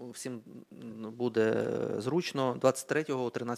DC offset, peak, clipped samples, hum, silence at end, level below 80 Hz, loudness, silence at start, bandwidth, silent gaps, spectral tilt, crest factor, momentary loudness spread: under 0.1%; -10 dBFS; under 0.1%; none; 0 s; -74 dBFS; -32 LUFS; 0 s; 16 kHz; none; -5.5 dB/octave; 22 dB; 17 LU